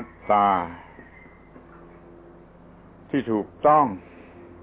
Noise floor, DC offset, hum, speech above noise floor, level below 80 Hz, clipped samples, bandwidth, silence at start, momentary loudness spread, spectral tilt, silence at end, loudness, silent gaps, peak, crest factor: -49 dBFS; under 0.1%; 50 Hz at -55 dBFS; 28 dB; -56 dBFS; under 0.1%; 4 kHz; 0 s; 21 LU; -10 dB/octave; 0.65 s; -22 LUFS; none; -8 dBFS; 18 dB